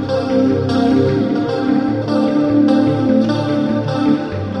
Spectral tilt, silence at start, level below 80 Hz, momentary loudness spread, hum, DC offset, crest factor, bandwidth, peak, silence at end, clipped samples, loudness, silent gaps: -8 dB/octave; 0 s; -46 dBFS; 4 LU; none; under 0.1%; 14 dB; 9.2 kHz; -2 dBFS; 0 s; under 0.1%; -15 LUFS; none